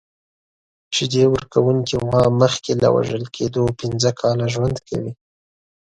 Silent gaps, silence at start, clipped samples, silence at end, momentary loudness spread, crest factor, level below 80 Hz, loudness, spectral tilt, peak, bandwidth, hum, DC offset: none; 0.9 s; under 0.1%; 0.8 s; 8 LU; 18 dB; -46 dBFS; -19 LUFS; -5.5 dB/octave; -2 dBFS; 9.6 kHz; none; under 0.1%